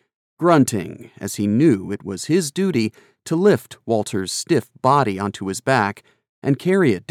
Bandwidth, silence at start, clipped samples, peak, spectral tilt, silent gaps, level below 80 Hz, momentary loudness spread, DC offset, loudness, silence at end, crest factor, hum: 16 kHz; 0.4 s; under 0.1%; -4 dBFS; -5.5 dB/octave; 6.29-6.42 s; -64 dBFS; 11 LU; under 0.1%; -20 LUFS; 0.1 s; 16 dB; none